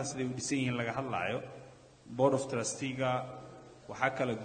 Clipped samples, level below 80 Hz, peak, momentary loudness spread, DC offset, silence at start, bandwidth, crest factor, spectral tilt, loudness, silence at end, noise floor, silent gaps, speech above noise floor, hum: under 0.1%; -68 dBFS; -12 dBFS; 19 LU; under 0.1%; 0 s; 9.4 kHz; 22 dB; -4.5 dB/octave; -34 LUFS; 0 s; -55 dBFS; none; 21 dB; none